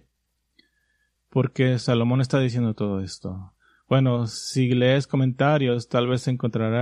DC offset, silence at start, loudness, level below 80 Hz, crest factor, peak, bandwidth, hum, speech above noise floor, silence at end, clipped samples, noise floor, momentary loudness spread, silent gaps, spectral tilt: under 0.1%; 1.35 s; -23 LUFS; -60 dBFS; 16 dB; -6 dBFS; 10.5 kHz; none; 52 dB; 0 s; under 0.1%; -74 dBFS; 8 LU; none; -6.5 dB/octave